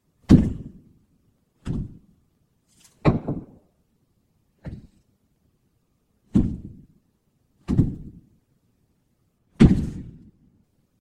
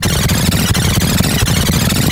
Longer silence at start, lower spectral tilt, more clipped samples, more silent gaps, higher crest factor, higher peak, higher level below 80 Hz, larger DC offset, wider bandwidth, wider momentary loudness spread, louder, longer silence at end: first, 0.3 s vs 0 s; first, -9 dB/octave vs -4 dB/octave; neither; neither; first, 26 dB vs 12 dB; about the same, 0 dBFS vs 0 dBFS; second, -36 dBFS vs -24 dBFS; neither; second, 10.5 kHz vs 19 kHz; first, 26 LU vs 0 LU; second, -22 LUFS vs -13 LUFS; first, 0.9 s vs 0 s